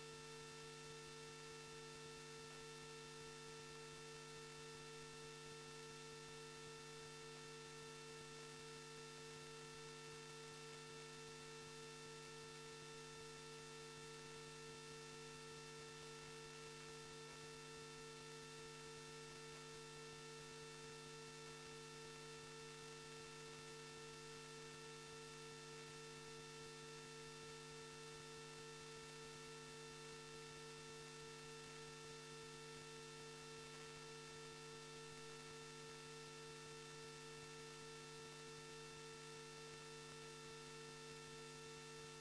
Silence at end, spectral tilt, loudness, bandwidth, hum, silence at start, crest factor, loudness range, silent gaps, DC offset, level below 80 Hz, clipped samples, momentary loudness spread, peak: 0 s; -3 dB/octave; -55 LUFS; 11 kHz; none; 0 s; 14 dB; 0 LU; none; under 0.1%; -78 dBFS; under 0.1%; 0 LU; -42 dBFS